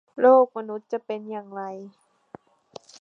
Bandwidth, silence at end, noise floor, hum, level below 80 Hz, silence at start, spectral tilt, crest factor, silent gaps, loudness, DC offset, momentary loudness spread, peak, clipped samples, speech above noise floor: 7 kHz; 1.1 s; -49 dBFS; none; -80 dBFS; 0.15 s; -6.5 dB/octave; 20 dB; none; -23 LUFS; under 0.1%; 19 LU; -6 dBFS; under 0.1%; 27 dB